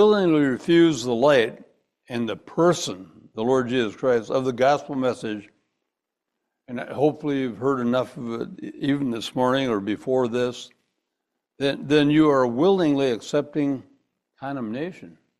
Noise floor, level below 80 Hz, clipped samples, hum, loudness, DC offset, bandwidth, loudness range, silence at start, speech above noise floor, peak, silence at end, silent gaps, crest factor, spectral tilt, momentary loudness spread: -83 dBFS; -62 dBFS; under 0.1%; none; -23 LUFS; under 0.1%; 12.5 kHz; 5 LU; 0 s; 61 dB; -6 dBFS; 0.3 s; none; 18 dB; -6 dB/octave; 15 LU